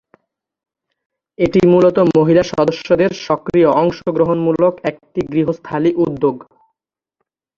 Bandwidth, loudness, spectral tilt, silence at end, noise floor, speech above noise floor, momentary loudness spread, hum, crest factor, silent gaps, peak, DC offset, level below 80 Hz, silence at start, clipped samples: 7.2 kHz; -15 LUFS; -7.5 dB/octave; 1.15 s; -77 dBFS; 63 dB; 9 LU; none; 14 dB; none; 0 dBFS; under 0.1%; -48 dBFS; 1.4 s; under 0.1%